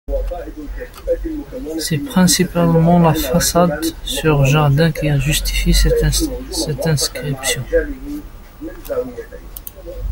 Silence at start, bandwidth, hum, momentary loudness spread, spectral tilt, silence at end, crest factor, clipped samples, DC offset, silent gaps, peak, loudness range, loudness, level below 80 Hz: 0.1 s; 17 kHz; none; 18 LU; -5 dB/octave; 0 s; 16 dB; under 0.1%; under 0.1%; none; -2 dBFS; 7 LU; -16 LUFS; -26 dBFS